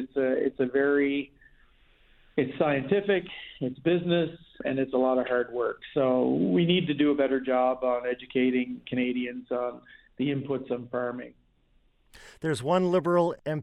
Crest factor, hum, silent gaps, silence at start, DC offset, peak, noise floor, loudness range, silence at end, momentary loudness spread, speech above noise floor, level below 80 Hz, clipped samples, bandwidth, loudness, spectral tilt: 18 dB; none; none; 0 s; under 0.1%; -10 dBFS; -65 dBFS; 7 LU; 0 s; 9 LU; 38 dB; -62 dBFS; under 0.1%; 11.5 kHz; -27 LUFS; -7 dB/octave